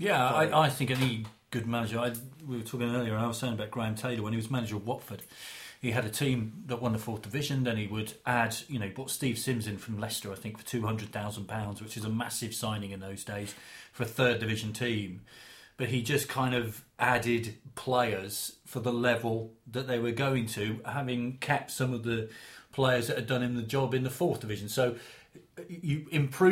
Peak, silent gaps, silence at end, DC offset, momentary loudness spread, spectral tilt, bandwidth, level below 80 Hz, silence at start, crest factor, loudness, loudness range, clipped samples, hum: -10 dBFS; none; 0 s; under 0.1%; 12 LU; -5 dB/octave; 16.5 kHz; -62 dBFS; 0 s; 22 dB; -32 LUFS; 4 LU; under 0.1%; none